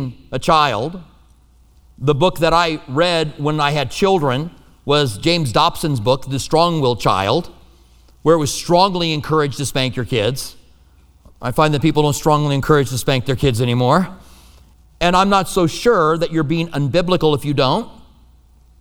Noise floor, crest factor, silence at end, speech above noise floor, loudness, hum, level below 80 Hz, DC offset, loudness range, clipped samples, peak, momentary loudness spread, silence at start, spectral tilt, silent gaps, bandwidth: -50 dBFS; 18 dB; 0.9 s; 34 dB; -17 LUFS; none; -38 dBFS; under 0.1%; 2 LU; under 0.1%; 0 dBFS; 8 LU; 0 s; -5.5 dB/octave; none; 18.5 kHz